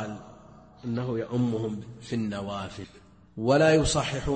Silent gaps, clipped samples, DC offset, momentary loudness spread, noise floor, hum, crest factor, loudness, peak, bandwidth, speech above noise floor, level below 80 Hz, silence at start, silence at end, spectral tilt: none; under 0.1%; under 0.1%; 21 LU; -51 dBFS; none; 18 dB; -27 LUFS; -10 dBFS; 8.8 kHz; 24 dB; -46 dBFS; 0 s; 0 s; -5.5 dB/octave